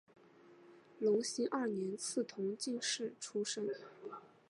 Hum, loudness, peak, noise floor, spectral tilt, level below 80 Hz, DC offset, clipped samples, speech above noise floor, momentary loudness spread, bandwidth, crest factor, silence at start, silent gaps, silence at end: none; -39 LUFS; -24 dBFS; -62 dBFS; -3 dB/octave; under -90 dBFS; under 0.1%; under 0.1%; 24 dB; 12 LU; 11.5 kHz; 16 dB; 0.45 s; none; 0.2 s